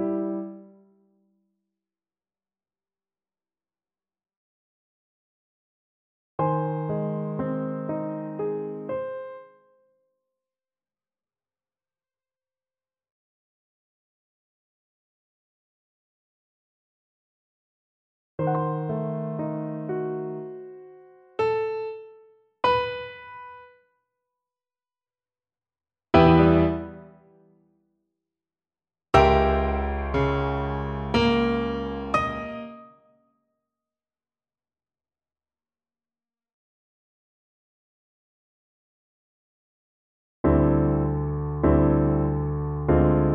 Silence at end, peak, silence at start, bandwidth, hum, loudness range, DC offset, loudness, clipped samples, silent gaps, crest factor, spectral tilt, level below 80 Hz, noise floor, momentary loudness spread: 0 s; -4 dBFS; 0 s; 8.4 kHz; none; 12 LU; under 0.1%; -24 LUFS; under 0.1%; 4.37-6.38 s, 13.11-18.38 s, 36.53-40.44 s; 24 dB; -8.5 dB/octave; -38 dBFS; under -90 dBFS; 19 LU